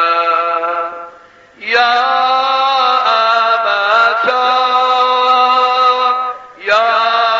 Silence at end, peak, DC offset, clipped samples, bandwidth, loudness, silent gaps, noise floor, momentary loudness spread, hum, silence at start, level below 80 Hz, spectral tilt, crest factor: 0 s; 0 dBFS; under 0.1%; under 0.1%; 7.6 kHz; -12 LUFS; none; -41 dBFS; 8 LU; none; 0 s; -62 dBFS; 3.5 dB/octave; 12 dB